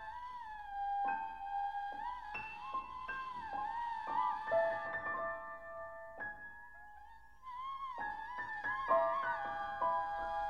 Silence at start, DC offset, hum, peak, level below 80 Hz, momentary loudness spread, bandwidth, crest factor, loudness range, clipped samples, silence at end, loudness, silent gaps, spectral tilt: 0 s; 0.1%; none; -20 dBFS; -66 dBFS; 14 LU; 11 kHz; 20 dB; 7 LU; under 0.1%; 0 s; -40 LUFS; none; -5 dB/octave